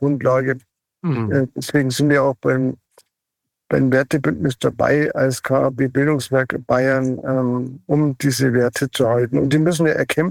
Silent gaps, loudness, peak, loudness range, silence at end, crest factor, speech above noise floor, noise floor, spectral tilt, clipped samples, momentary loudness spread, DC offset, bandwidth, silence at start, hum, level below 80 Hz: none; -19 LUFS; -4 dBFS; 2 LU; 0 s; 14 dB; 63 dB; -81 dBFS; -6 dB/octave; under 0.1%; 5 LU; under 0.1%; 17 kHz; 0 s; none; -52 dBFS